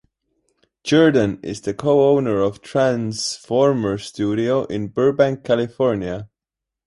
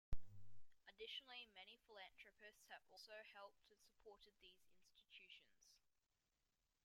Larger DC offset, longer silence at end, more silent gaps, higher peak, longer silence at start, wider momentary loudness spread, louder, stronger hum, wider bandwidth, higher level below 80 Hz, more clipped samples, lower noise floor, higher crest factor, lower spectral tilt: neither; second, 0.6 s vs 1.15 s; neither; first, -2 dBFS vs -32 dBFS; first, 0.85 s vs 0.1 s; second, 10 LU vs 13 LU; first, -19 LUFS vs -61 LUFS; neither; second, 11.5 kHz vs 16 kHz; first, -52 dBFS vs -64 dBFS; neither; second, -86 dBFS vs under -90 dBFS; second, 16 dB vs 22 dB; first, -6 dB/octave vs -3 dB/octave